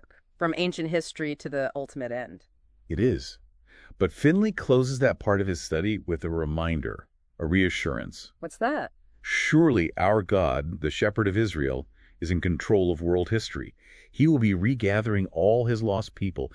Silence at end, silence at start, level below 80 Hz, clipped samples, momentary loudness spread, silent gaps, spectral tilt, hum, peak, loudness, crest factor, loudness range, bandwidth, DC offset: 0.05 s; 0.4 s; -44 dBFS; under 0.1%; 13 LU; none; -6.5 dB/octave; none; -8 dBFS; -26 LUFS; 18 dB; 5 LU; 11 kHz; under 0.1%